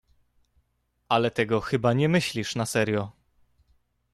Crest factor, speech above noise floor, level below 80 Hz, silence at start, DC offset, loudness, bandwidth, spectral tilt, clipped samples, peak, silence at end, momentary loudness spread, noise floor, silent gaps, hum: 20 dB; 48 dB; -58 dBFS; 1.1 s; under 0.1%; -25 LUFS; 13.5 kHz; -5.5 dB/octave; under 0.1%; -8 dBFS; 1 s; 6 LU; -73 dBFS; none; none